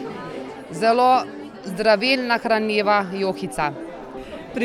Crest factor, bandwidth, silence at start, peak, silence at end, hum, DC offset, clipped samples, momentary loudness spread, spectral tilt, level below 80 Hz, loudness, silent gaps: 18 dB; 13.5 kHz; 0 s; -4 dBFS; 0 s; none; under 0.1%; under 0.1%; 18 LU; -4.5 dB/octave; -54 dBFS; -20 LUFS; none